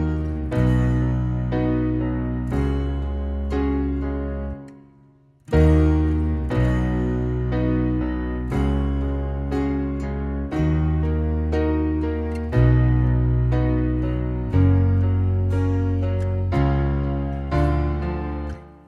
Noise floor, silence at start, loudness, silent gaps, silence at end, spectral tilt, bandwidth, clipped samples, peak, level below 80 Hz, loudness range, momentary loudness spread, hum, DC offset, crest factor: -54 dBFS; 0 s; -22 LUFS; none; 0.15 s; -9.5 dB/octave; 7.2 kHz; under 0.1%; -4 dBFS; -26 dBFS; 4 LU; 8 LU; none; under 0.1%; 16 dB